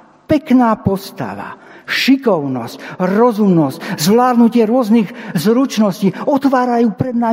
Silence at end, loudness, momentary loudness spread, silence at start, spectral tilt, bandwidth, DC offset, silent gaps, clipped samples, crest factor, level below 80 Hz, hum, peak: 0 s; -14 LUFS; 12 LU; 0.3 s; -6 dB/octave; 16.5 kHz; under 0.1%; none; under 0.1%; 14 dB; -52 dBFS; none; 0 dBFS